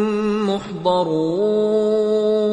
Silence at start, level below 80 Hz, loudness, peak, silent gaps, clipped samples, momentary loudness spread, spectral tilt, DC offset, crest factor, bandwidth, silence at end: 0 s; -56 dBFS; -19 LUFS; -4 dBFS; none; under 0.1%; 4 LU; -7 dB/octave; under 0.1%; 14 dB; 9.4 kHz; 0 s